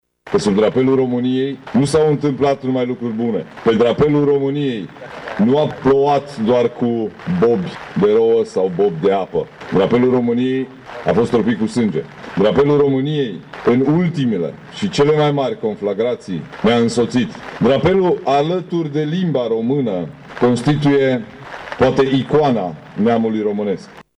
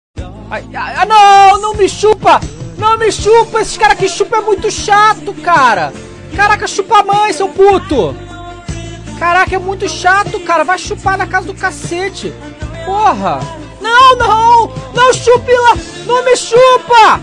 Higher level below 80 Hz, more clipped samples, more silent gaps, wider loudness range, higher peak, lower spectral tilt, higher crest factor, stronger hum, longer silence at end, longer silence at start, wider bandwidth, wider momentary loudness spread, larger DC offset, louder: second, -48 dBFS vs -34 dBFS; second, under 0.1% vs 0.1%; neither; second, 1 LU vs 6 LU; second, -4 dBFS vs 0 dBFS; first, -7 dB/octave vs -3.5 dB/octave; about the same, 12 dB vs 10 dB; neither; first, 0.15 s vs 0 s; about the same, 0.25 s vs 0.15 s; about the same, 10.5 kHz vs 11.5 kHz; second, 9 LU vs 18 LU; neither; second, -17 LUFS vs -10 LUFS